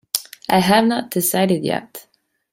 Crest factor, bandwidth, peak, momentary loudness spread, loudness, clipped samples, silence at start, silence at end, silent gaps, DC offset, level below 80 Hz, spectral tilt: 20 dB; 16.5 kHz; 0 dBFS; 13 LU; -18 LUFS; under 0.1%; 0.15 s; 0.55 s; none; under 0.1%; -58 dBFS; -4 dB/octave